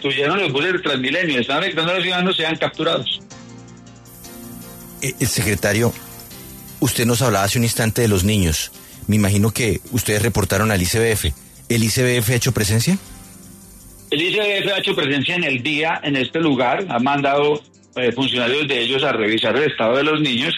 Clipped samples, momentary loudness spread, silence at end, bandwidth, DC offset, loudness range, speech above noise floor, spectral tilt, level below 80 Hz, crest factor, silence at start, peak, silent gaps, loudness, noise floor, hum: under 0.1%; 14 LU; 0 s; 14 kHz; under 0.1%; 5 LU; 23 dB; -4 dB/octave; -42 dBFS; 14 dB; 0 s; -4 dBFS; none; -18 LUFS; -42 dBFS; none